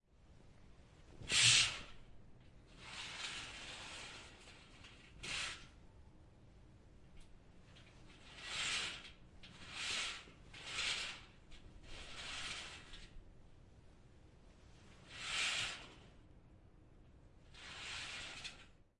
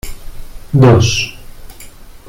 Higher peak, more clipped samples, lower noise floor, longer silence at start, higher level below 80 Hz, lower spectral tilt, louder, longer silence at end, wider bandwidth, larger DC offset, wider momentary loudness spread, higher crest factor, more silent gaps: second, -16 dBFS vs -2 dBFS; neither; first, -63 dBFS vs -34 dBFS; first, 0.2 s vs 0.05 s; second, -64 dBFS vs -30 dBFS; second, 0 dB/octave vs -5.5 dB/octave; second, -39 LUFS vs -11 LUFS; first, 0.25 s vs 0.1 s; second, 11.5 kHz vs 16 kHz; neither; first, 24 LU vs 16 LU; first, 28 dB vs 14 dB; neither